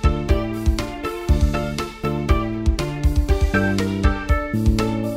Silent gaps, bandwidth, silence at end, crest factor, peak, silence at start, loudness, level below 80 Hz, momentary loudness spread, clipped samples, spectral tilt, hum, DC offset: none; 15.5 kHz; 0 s; 16 dB; -4 dBFS; 0 s; -21 LUFS; -22 dBFS; 6 LU; under 0.1%; -6.5 dB/octave; none; under 0.1%